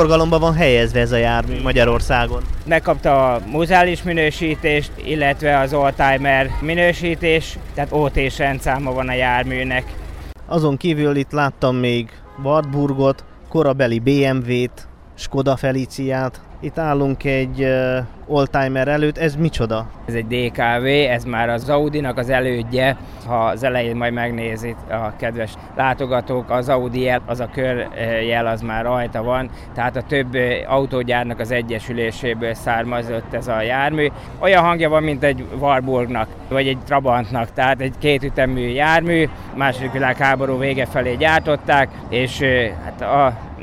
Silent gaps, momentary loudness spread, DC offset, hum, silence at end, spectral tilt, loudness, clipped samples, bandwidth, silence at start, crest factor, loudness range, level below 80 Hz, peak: none; 8 LU; under 0.1%; none; 0 s; -6.5 dB/octave; -18 LUFS; under 0.1%; 15.5 kHz; 0 s; 16 dB; 4 LU; -32 dBFS; -2 dBFS